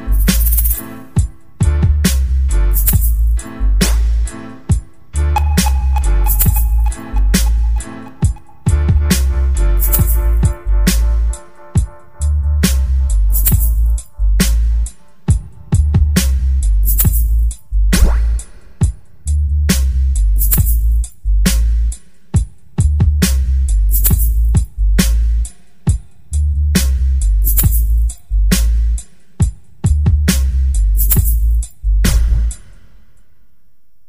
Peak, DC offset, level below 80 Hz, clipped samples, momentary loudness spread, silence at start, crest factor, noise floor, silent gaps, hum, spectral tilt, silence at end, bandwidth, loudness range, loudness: 0 dBFS; 2%; -14 dBFS; under 0.1%; 7 LU; 0 s; 14 dB; -60 dBFS; none; none; -5 dB/octave; 1.5 s; 16.5 kHz; 1 LU; -16 LUFS